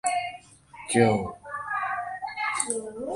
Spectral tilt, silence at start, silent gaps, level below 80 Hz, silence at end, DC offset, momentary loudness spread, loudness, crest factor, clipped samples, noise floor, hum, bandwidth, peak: -4 dB/octave; 0.05 s; none; -58 dBFS; 0 s; under 0.1%; 14 LU; -27 LUFS; 22 dB; under 0.1%; -48 dBFS; none; 11.5 kHz; -6 dBFS